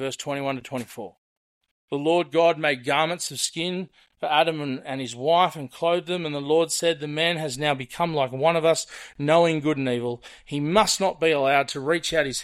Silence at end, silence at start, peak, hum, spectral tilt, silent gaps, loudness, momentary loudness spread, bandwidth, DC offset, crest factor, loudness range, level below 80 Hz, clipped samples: 0 s; 0 s; -6 dBFS; none; -4 dB/octave; 1.18-1.61 s, 1.71-1.88 s; -24 LUFS; 12 LU; 15.5 kHz; under 0.1%; 18 dB; 2 LU; -60 dBFS; under 0.1%